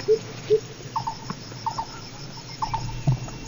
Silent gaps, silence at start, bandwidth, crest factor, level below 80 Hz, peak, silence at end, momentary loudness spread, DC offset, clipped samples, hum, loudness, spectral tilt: none; 0 s; over 20 kHz; 18 dB; -44 dBFS; -10 dBFS; 0 s; 12 LU; under 0.1%; under 0.1%; none; -29 LUFS; -5.5 dB/octave